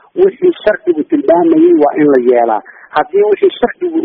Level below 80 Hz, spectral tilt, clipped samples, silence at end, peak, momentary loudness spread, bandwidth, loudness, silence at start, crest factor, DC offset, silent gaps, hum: -52 dBFS; -4.5 dB/octave; under 0.1%; 0 s; 0 dBFS; 7 LU; 4.4 kHz; -11 LUFS; 0.15 s; 10 dB; under 0.1%; none; none